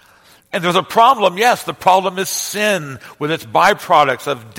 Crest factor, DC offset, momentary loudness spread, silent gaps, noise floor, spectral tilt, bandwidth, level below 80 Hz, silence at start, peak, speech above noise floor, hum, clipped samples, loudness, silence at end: 16 dB; under 0.1%; 10 LU; none; -49 dBFS; -3 dB/octave; 17 kHz; -58 dBFS; 0.55 s; 0 dBFS; 34 dB; none; under 0.1%; -15 LUFS; 0 s